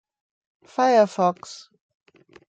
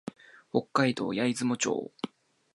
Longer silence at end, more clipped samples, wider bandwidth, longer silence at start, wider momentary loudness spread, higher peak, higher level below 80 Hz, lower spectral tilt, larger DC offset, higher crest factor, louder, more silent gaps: first, 0.95 s vs 0.45 s; neither; second, 9 kHz vs 11.5 kHz; first, 0.8 s vs 0.05 s; first, 22 LU vs 14 LU; first, -6 dBFS vs -10 dBFS; about the same, -78 dBFS vs -74 dBFS; about the same, -5 dB/octave vs -4.5 dB/octave; neither; about the same, 18 dB vs 20 dB; first, -20 LUFS vs -29 LUFS; neither